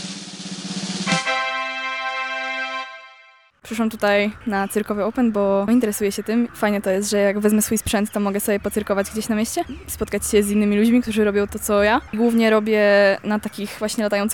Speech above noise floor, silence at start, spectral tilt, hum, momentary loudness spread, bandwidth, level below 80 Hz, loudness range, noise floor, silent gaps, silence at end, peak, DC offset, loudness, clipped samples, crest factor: 32 dB; 0 s; -4.5 dB/octave; none; 10 LU; 19 kHz; -46 dBFS; 6 LU; -51 dBFS; none; 0 s; -6 dBFS; 0.2%; -20 LUFS; under 0.1%; 14 dB